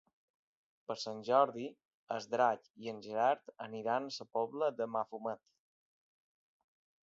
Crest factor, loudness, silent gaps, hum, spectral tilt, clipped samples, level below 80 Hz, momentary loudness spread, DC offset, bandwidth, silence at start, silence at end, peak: 22 dB; -36 LUFS; 1.85-2.07 s, 2.70-2.74 s; none; -3 dB/octave; under 0.1%; -88 dBFS; 14 LU; under 0.1%; 7.6 kHz; 0.9 s; 1.7 s; -16 dBFS